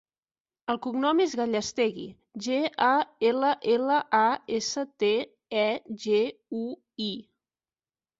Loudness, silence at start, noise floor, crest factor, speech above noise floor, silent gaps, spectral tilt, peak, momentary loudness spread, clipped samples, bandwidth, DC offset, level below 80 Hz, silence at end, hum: -27 LUFS; 0.7 s; under -90 dBFS; 18 dB; over 63 dB; none; -3.5 dB/octave; -10 dBFS; 11 LU; under 0.1%; 7.8 kHz; under 0.1%; -72 dBFS; 1 s; none